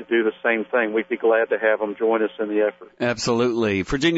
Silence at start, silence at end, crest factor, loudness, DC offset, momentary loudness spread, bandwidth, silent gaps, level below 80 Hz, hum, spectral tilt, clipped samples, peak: 0 s; 0 s; 16 dB; -22 LUFS; under 0.1%; 4 LU; 8 kHz; none; -48 dBFS; none; -5 dB/octave; under 0.1%; -6 dBFS